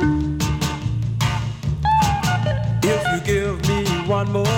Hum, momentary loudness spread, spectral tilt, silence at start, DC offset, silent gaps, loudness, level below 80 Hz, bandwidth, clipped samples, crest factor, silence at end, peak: none; 5 LU; -5.5 dB/octave; 0 s; under 0.1%; none; -21 LUFS; -32 dBFS; 17.5 kHz; under 0.1%; 14 dB; 0 s; -6 dBFS